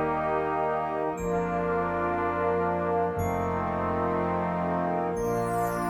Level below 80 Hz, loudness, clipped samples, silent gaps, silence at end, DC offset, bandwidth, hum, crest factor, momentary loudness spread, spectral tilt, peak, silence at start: -48 dBFS; -28 LUFS; under 0.1%; none; 0 s; under 0.1%; 18 kHz; none; 14 dB; 2 LU; -7.5 dB/octave; -14 dBFS; 0 s